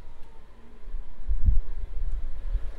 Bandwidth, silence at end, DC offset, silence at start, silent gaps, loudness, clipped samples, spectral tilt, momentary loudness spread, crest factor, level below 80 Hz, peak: 2.1 kHz; 0 s; under 0.1%; 0 s; none; -34 LUFS; under 0.1%; -8.5 dB/octave; 24 LU; 16 dB; -28 dBFS; -8 dBFS